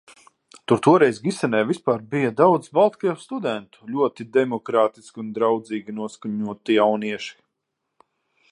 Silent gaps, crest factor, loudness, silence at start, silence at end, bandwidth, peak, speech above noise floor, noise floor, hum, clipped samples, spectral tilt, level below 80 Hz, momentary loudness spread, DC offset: none; 20 dB; -22 LUFS; 0.55 s; 1.2 s; 11 kHz; -2 dBFS; 58 dB; -79 dBFS; none; under 0.1%; -6 dB/octave; -70 dBFS; 14 LU; under 0.1%